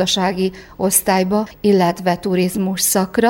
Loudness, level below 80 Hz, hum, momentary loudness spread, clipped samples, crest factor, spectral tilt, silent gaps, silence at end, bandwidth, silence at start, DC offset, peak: -17 LUFS; -48 dBFS; none; 6 LU; under 0.1%; 16 dB; -4 dB/octave; none; 0 s; 19 kHz; 0 s; under 0.1%; 0 dBFS